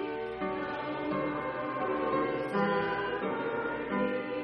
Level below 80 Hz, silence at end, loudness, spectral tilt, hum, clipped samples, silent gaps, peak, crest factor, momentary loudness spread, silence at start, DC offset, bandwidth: -62 dBFS; 0 s; -32 LUFS; -8 dB/octave; none; under 0.1%; none; -18 dBFS; 14 dB; 5 LU; 0 s; under 0.1%; 9 kHz